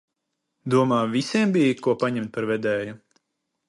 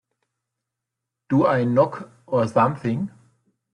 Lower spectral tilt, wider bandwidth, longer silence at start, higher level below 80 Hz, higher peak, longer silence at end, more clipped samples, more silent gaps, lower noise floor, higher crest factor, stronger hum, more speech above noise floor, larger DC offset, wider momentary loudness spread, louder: second, -6 dB/octave vs -8.5 dB/octave; about the same, 11.5 kHz vs 10.5 kHz; second, 0.65 s vs 1.3 s; second, -68 dBFS vs -62 dBFS; about the same, -6 dBFS vs -6 dBFS; about the same, 0.7 s vs 0.65 s; neither; neither; second, -79 dBFS vs -84 dBFS; about the same, 18 dB vs 18 dB; neither; second, 57 dB vs 64 dB; neither; about the same, 8 LU vs 10 LU; about the same, -23 LUFS vs -21 LUFS